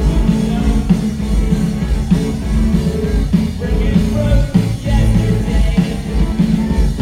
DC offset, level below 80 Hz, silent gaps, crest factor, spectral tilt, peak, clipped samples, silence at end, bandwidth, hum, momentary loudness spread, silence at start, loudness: under 0.1%; -18 dBFS; none; 14 dB; -7.5 dB/octave; 0 dBFS; under 0.1%; 0 s; 13.5 kHz; none; 4 LU; 0 s; -16 LUFS